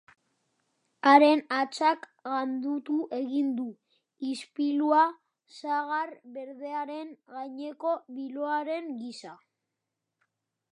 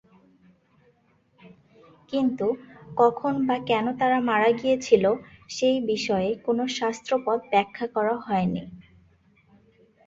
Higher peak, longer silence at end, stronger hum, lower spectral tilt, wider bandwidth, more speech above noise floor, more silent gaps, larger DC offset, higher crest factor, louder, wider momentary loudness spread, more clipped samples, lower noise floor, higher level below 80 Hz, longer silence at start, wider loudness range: about the same, -4 dBFS vs -6 dBFS; first, 1.4 s vs 1.25 s; neither; second, -3.5 dB/octave vs -5.5 dB/octave; first, 11 kHz vs 7.8 kHz; first, 57 dB vs 40 dB; neither; neither; first, 26 dB vs 20 dB; second, -28 LUFS vs -24 LUFS; first, 18 LU vs 9 LU; neither; first, -85 dBFS vs -64 dBFS; second, -90 dBFS vs -62 dBFS; second, 1.05 s vs 1.45 s; first, 10 LU vs 5 LU